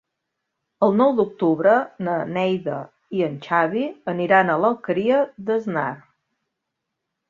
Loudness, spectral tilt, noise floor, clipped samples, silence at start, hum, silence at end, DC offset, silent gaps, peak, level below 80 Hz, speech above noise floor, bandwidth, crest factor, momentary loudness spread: -21 LUFS; -8 dB/octave; -80 dBFS; under 0.1%; 0.8 s; none; 1.3 s; under 0.1%; none; -2 dBFS; -68 dBFS; 60 dB; 7.2 kHz; 20 dB; 9 LU